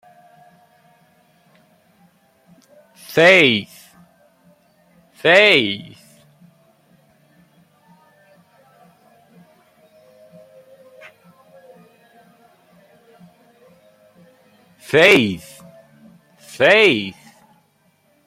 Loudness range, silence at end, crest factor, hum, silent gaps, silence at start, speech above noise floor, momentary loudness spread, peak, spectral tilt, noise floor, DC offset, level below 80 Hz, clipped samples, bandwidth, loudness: 4 LU; 1.15 s; 22 dB; none; none; 3.1 s; 47 dB; 22 LU; 0 dBFS; -4 dB/octave; -60 dBFS; under 0.1%; -66 dBFS; under 0.1%; 16 kHz; -13 LUFS